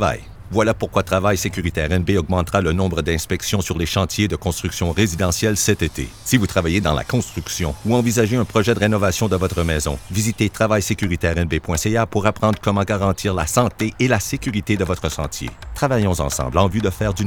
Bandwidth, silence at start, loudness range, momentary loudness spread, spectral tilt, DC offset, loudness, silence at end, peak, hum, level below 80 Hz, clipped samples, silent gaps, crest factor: 19.5 kHz; 0 s; 1 LU; 5 LU; -5 dB/octave; 0.3%; -20 LUFS; 0 s; 0 dBFS; none; -34 dBFS; under 0.1%; none; 20 dB